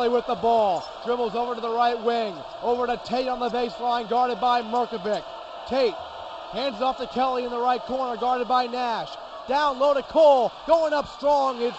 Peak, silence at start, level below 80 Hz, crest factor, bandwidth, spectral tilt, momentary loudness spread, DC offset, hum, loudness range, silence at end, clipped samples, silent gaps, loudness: -6 dBFS; 0 s; -56 dBFS; 18 dB; 8.4 kHz; -4.5 dB/octave; 9 LU; under 0.1%; none; 4 LU; 0 s; under 0.1%; none; -24 LUFS